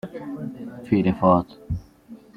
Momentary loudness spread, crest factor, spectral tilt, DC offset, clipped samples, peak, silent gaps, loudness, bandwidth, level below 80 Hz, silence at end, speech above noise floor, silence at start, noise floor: 15 LU; 20 dB; -9.5 dB/octave; under 0.1%; under 0.1%; -4 dBFS; none; -23 LUFS; 5.8 kHz; -46 dBFS; 0.2 s; 25 dB; 0.05 s; -46 dBFS